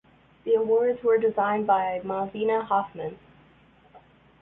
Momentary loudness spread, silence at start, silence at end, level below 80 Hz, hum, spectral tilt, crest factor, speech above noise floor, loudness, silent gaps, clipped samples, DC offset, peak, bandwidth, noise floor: 12 LU; 0.45 s; 0.45 s; -64 dBFS; none; -9.5 dB/octave; 16 dB; 33 dB; -25 LUFS; none; under 0.1%; under 0.1%; -10 dBFS; 3.9 kHz; -57 dBFS